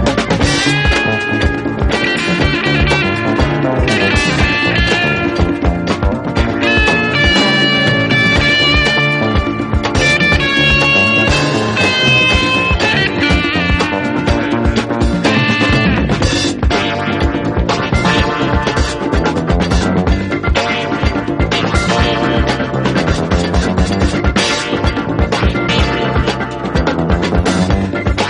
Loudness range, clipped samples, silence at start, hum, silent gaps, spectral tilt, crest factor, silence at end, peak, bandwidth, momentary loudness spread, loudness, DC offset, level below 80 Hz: 4 LU; under 0.1%; 0 s; none; none; -5 dB/octave; 12 dB; 0 s; 0 dBFS; 11.5 kHz; 6 LU; -13 LUFS; under 0.1%; -22 dBFS